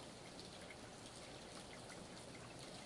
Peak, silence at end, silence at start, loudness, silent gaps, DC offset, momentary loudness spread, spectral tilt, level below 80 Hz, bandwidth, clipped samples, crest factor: -38 dBFS; 0 s; 0 s; -54 LUFS; none; under 0.1%; 1 LU; -3.5 dB/octave; -72 dBFS; 11.5 kHz; under 0.1%; 16 dB